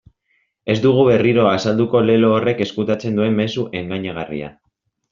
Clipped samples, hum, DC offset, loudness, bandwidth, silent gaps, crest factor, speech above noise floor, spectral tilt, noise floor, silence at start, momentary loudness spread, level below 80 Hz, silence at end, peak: under 0.1%; none; under 0.1%; -17 LUFS; 7.4 kHz; none; 14 dB; 49 dB; -5.5 dB/octave; -66 dBFS; 0.65 s; 13 LU; -54 dBFS; 0.6 s; -2 dBFS